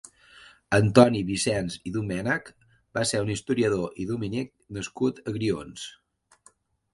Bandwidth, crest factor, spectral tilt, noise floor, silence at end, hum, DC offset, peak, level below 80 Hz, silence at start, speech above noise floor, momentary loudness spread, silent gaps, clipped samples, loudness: 11.5 kHz; 26 dB; -5.5 dB/octave; -61 dBFS; 1.05 s; none; under 0.1%; 0 dBFS; -54 dBFS; 0.7 s; 36 dB; 16 LU; none; under 0.1%; -26 LUFS